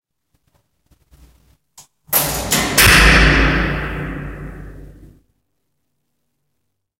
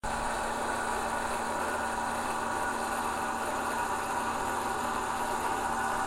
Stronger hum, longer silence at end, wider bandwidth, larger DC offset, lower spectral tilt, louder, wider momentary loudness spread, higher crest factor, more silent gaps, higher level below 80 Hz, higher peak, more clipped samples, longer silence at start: neither; first, 2.1 s vs 0 s; about the same, 17 kHz vs 16 kHz; neither; about the same, -3 dB/octave vs -3 dB/octave; first, -13 LUFS vs -32 LUFS; first, 24 LU vs 1 LU; about the same, 18 dB vs 14 dB; neither; first, -26 dBFS vs -52 dBFS; first, 0 dBFS vs -18 dBFS; neither; first, 2.1 s vs 0.05 s